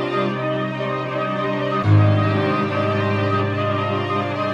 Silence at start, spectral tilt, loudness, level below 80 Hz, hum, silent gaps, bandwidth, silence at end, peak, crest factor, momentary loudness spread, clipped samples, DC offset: 0 s; -8 dB/octave; -20 LUFS; -54 dBFS; none; none; 7 kHz; 0 s; -4 dBFS; 16 dB; 7 LU; under 0.1%; under 0.1%